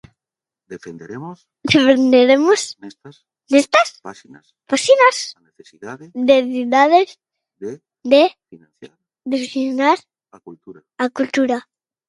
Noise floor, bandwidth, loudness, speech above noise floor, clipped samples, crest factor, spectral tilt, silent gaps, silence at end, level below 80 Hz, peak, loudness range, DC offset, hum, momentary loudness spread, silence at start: -89 dBFS; 11.5 kHz; -15 LUFS; 72 dB; under 0.1%; 18 dB; -3.5 dB/octave; none; 0.5 s; -62 dBFS; 0 dBFS; 4 LU; under 0.1%; none; 23 LU; 0.7 s